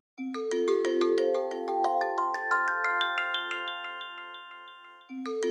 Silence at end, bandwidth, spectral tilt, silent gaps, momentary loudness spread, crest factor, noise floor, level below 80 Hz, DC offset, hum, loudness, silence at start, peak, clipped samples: 0 s; 10 kHz; -1.5 dB/octave; none; 17 LU; 16 dB; -50 dBFS; -88 dBFS; under 0.1%; none; -29 LUFS; 0.2 s; -14 dBFS; under 0.1%